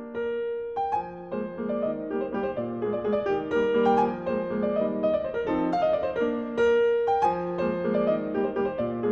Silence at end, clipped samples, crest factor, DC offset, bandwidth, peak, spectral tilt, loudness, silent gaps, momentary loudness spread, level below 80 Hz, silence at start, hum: 0 s; under 0.1%; 16 dB; under 0.1%; 6.8 kHz; -10 dBFS; -7.5 dB/octave; -27 LUFS; none; 8 LU; -56 dBFS; 0 s; none